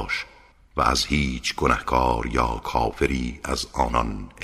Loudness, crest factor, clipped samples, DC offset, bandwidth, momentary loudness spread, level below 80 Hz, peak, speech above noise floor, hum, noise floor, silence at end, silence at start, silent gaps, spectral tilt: -24 LUFS; 20 dB; under 0.1%; under 0.1%; 15.5 kHz; 7 LU; -32 dBFS; -4 dBFS; 28 dB; none; -52 dBFS; 0 s; 0 s; none; -4.5 dB/octave